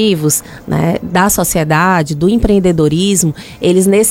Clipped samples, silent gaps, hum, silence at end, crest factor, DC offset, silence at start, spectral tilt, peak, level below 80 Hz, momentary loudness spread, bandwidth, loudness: under 0.1%; none; none; 0 s; 12 dB; under 0.1%; 0 s; -4.5 dB/octave; 0 dBFS; -30 dBFS; 5 LU; 16.5 kHz; -12 LUFS